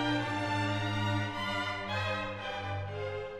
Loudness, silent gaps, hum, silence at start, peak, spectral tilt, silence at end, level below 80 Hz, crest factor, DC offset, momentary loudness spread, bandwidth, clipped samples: -34 LUFS; none; none; 0 s; -18 dBFS; -5.5 dB/octave; 0 s; -56 dBFS; 14 dB; under 0.1%; 6 LU; 12 kHz; under 0.1%